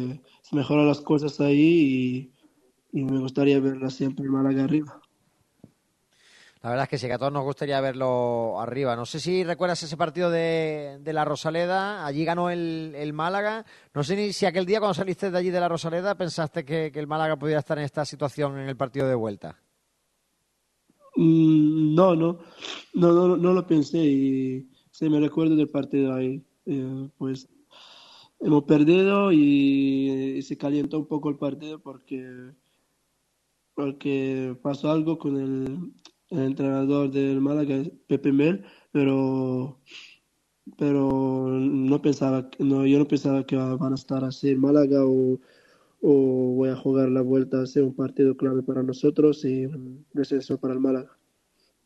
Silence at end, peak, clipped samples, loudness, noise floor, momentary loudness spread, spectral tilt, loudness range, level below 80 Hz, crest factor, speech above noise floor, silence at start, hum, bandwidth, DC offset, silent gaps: 0.8 s; -4 dBFS; under 0.1%; -24 LUFS; -73 dBFS; 13 LU; -7.5 dB/octave; 7 LU; -66 dBFS; 20 dB; 50 dB; 0 s; none; 10.5 kHz; under 0.1%; none